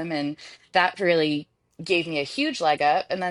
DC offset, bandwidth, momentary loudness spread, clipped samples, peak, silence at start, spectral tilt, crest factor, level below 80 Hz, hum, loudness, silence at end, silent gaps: under 0.1%; 11.5 kHz; 10 LU; under 0.1%; -4 dBFS; 0 s; -4.5 dB/octave; 20 dB; -68 dBFS; none; -24 LUFS; 0 s; none